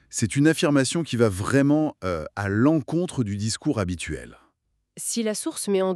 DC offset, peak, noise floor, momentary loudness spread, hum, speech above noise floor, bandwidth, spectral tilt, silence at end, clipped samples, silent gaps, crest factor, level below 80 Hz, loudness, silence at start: under 0.1%; -4 dBFS; -71 dBFS; 9 LU; none; 48 dB; 13.5 kHz; -5 dB/octave; 0 s; under 0.1%; none; 18 dB; -52 dBFS; -24 LUFS; 0.1 s